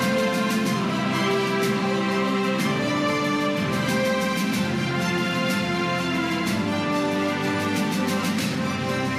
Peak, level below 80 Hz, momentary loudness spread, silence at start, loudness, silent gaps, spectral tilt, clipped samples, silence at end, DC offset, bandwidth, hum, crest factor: -12 dBFS; -58 dBFS; 2 LU; 0 s; -23 LUFS; none; -5 dB/octave; under 0.1%; 0 s; under 0.1%; 15.5 kHz; none; 12 dB